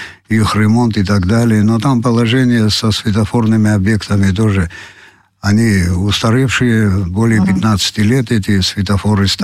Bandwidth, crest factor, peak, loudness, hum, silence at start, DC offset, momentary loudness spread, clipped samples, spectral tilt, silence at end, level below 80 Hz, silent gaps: 14 kHz; 10 dB; -2 dBFS; -13 LUFS; none; 0 s; 0.5%; 3 LU; under 0.1%; -6 dB/octave; 0 s; -36 dBFS; none